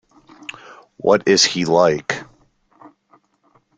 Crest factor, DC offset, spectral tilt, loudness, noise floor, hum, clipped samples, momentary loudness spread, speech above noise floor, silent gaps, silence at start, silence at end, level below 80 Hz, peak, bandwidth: 20 dB; under 0.1%; -3 dB/octave; -16 LUFS; -60 dBFS; none; under 0.1%; 21 LU; 44 dB; none; 0.7 s; 1.55 s; -58 dBFS; 0 dBFS; 9.4 kHz